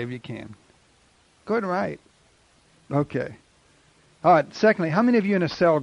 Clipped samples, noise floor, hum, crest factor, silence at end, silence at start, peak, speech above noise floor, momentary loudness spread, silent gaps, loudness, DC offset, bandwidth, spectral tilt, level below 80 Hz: under 0.1%; -60 dBFS; none; 18 dB; 0 s; 0 s; -6 dBFS; 38 dB; 17 LU; none; -23 LUFS; under 0.1%; 10.5 kHz; -7.5 dB/octave; -62 dBFS